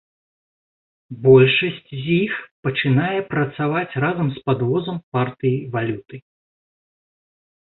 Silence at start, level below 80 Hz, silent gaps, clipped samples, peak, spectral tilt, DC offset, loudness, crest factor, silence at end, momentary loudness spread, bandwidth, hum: 1.1 s; -56 dBFS; 2.51-2.63 s, 5.03-5.12 s; under 0.1%; -2 dBFS; -11.5 dB/octave; under 0.1%; -20 LUFS; 18 dB; 1.55 s; 12 LU; 4.2 kHz; none